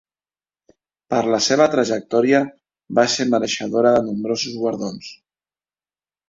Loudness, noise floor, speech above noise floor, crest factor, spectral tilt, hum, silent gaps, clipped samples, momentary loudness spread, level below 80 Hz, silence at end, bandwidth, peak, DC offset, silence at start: -19 LUFS; under -90 dBFS; over 72 dB; 18 dB; -4 dB/octave; none; none; under 0.1%; 11 LU; -62 dBFS; 1.15 s; 7.8 kHz; -2 dBFS; under 0.1%; 1.1 s